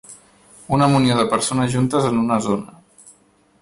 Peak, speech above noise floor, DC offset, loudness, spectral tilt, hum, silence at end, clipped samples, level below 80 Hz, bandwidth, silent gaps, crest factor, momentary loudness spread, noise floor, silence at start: -6 dBFS; 38 dB; under 0.1%; -18 LUFS; -5.5 dB/octave; none; 0.95 s; under 0.1%; -50 dBFS; 11.5 kHz; none; 14 dB; 7 LU; -56 dBFS; 0.1 s